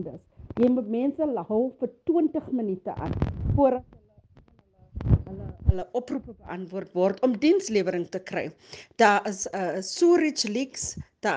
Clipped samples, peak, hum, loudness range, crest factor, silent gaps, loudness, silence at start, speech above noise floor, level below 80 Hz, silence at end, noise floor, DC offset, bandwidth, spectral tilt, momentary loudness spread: under 0.1%; -6 dBFS; none; 4 LU; 20 dB; none; -26 LUFS; 0 s; 33 dB; -40 dBFS; 0 s; -58 dBFS; under 0.1%; 10 kHz; -5.5 dB/octave; 14 LU